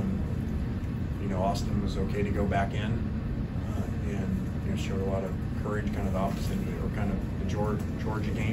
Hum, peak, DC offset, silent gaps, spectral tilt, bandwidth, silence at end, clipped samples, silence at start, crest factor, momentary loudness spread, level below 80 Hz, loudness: none; -14 dBFS; under 0.1%; none; -7.5 dB/octave; 16 kHz; 0 s; under 0.1%; 0 s; 16 dB; 4 LU; -36 dBFS; -31 LUFS